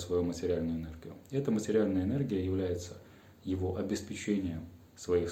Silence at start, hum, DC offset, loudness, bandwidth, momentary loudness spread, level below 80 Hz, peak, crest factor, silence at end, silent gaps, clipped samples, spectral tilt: 0 s; none; under 0.1%; -34 LUFS; 16.5 kHz; 16 LU; -60 dBFS; -16 dBFS; 16 dB; 0 s; none; under 0.1%; -6.5 dB/octave